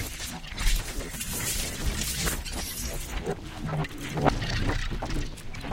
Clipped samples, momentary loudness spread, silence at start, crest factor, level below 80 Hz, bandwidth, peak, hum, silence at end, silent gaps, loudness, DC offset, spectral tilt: under 0.1%; 8 LU; 0 s; 24 dB; -34 dBFS; 17 kHz; -6 dBFS; none; 0 s; none; -31 LUFS; under 0.1%; -3.5 dB/octave